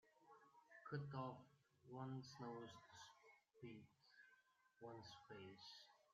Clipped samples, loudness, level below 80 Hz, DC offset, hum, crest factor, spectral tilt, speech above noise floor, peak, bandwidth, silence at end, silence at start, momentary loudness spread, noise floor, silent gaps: under 0.1%; -57 LUFS; under -90 dBFS; under 0.1%; none; 22 dB; -5 dB/octave; 23 dB; -36 dBFS; 7.4 kHz; 0 s; 0.05 s; 12 LU; -79 dBFS; none